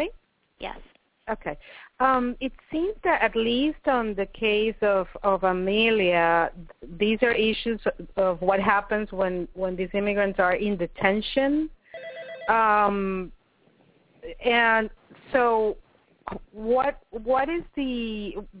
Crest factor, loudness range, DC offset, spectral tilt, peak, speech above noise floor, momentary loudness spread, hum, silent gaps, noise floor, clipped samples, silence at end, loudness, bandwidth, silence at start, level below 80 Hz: 20 dB; 3 LU; under 0.1%; -9 dB/octave; -6 dBFS; 37 dB; 17 LU; none; none; -62 dBFS; under 0.1%; 0 s; -24 LUFS; 4 kHz; 0 s; -48 dBFS